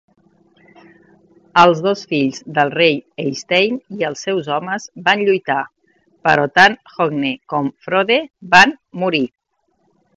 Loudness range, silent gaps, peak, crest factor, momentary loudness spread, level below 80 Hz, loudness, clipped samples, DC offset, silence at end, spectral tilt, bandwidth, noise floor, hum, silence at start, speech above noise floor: 3 LU; none; 0 dBFS; 18 dB; 11 LU; -58 dBFS; -16 LUFS; under 0.1%; under 0.1%; 0.9 s; -4.5 dB/octave; 12 kHz; -65 dBFS; none; 1.55 s; 49 dB